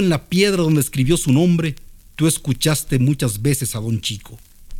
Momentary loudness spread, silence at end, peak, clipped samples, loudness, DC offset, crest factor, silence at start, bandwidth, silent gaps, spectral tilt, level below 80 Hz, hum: 10 LU; 0 s; -2 dBFS; under 0.1%; -18 LUFS; under 0.1%; 16 dB; 0 s; 18.5 kHz; none; -5 dB/octave; -38 dBFS; none